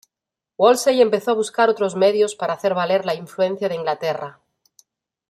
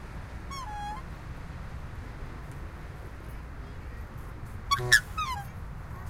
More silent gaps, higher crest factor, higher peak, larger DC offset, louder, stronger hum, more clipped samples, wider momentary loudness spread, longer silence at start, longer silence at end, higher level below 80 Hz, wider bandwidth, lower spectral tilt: neither; second, 18 dB vs 32 dB; about the same, -2 dBFS vs -4 dBFS; neither; first, -19 LUFS vs -33 LUFS; neither; neither; second, 9 LU vs 20 LU; first, 0.6 s vs 0 s; first, 1 s vs 0 s; second, -70 dBFS vs -42 dBFS; about the same, 15 kHz vs 16 kHz; first, -4 dB/octave vs -2.5 dB/octave